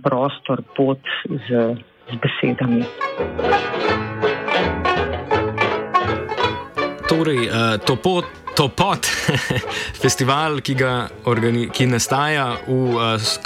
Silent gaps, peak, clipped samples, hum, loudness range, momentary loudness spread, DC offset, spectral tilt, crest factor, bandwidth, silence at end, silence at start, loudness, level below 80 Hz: none; -4 dBFS; under 0.1%; none; 2 LU; 6 LU; under 0.1%; -4.5 dB/octave; 16 dB; 16.5 kHz; 0 s; 0 s; -20 LUFS; -44 dBFS